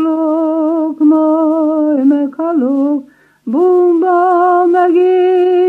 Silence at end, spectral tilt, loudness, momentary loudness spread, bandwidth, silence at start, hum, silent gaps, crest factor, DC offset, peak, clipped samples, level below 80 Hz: 0 s; -7.5 dB/octave; -12 LUFS; 5 LU; 3.3 kHz; 0 s; none; none; 10 dB; under 0.1%; -2 dBFS; under 0.1%; -72 dBFS